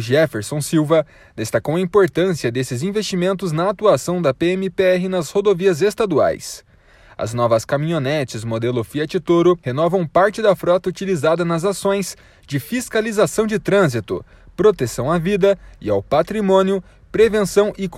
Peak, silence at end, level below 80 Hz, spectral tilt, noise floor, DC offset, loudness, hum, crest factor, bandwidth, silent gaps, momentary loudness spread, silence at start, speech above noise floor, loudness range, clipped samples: -2 dBFS; 0 s; -48 dBFS; -5.5 dB/octave; -48 dBFS; under 0.1%; -18 LUFS; none; 16 dB; 15.5 kHz; none; 8 LU; 0 s; 30 dB; 2 LU; under 0.1%